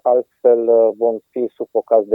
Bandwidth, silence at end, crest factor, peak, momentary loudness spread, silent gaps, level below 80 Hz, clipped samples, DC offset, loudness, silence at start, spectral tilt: 2.6 kHz; 0 s; 14 dB; -2 dBFS; 10 LU; none; -82 dBFS; under 0.1%; under 0.1%; -17 LUFS; 0.05 s; -10 dB/octave